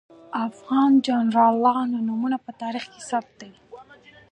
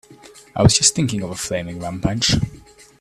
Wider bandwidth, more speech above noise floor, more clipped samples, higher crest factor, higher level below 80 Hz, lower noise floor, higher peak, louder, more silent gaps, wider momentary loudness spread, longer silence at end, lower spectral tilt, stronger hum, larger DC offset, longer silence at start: second, 9.4 kHz vs 14 kHz; about the same, 28 dB vs 26 dB; neither; about the same, 16 dB vs 20 dB; second, -72 dBFS vs -38 dBFS; first, -50 dBFS vs -45 dBFS; second, -6 dBFS vs 0 dBFS; second, -22 LUFS vs -18 LUFS; neither; about the same, 13 LU vs 15 LU; about the same, 0.5 s vs 0.4 s; first, -5.5 dB/octave vs -3.5 dB/octave; neither; neither; first, 0.3 s vs 0.1 s